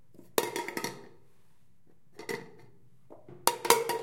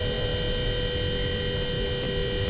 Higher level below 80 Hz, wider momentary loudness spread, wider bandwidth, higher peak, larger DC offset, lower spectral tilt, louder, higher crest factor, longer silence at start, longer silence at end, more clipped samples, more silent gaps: second, -72 dBFS vs -34 dBFS; first, 23 LU vs 1 LU; first, 16.5 kHz vs 4 kHz; first, 0 dBFS vs -16 dBFS; first, 0.2% vs under 0.1%; second, -1.5 dB/octave vs -9.5 dB/octave; second, -31 LUFS vs -28 LUFS; first, 34 dB vs 12 dB; first, 0.35 s vs 0 s; about the same, 0 s vs 0 s; neither; neither